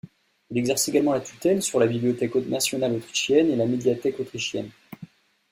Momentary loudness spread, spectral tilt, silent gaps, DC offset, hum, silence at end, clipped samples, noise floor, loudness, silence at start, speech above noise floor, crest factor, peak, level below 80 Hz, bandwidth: 11 LU; -4 dB/octave; none; under 0.1%; none; 0.45 s; under 0.1%; -47 dBFS; -24 LUFS; 0.05 s; 24 dB; 18 dB; -8 dBFS; -64 dBFS; 16 kHz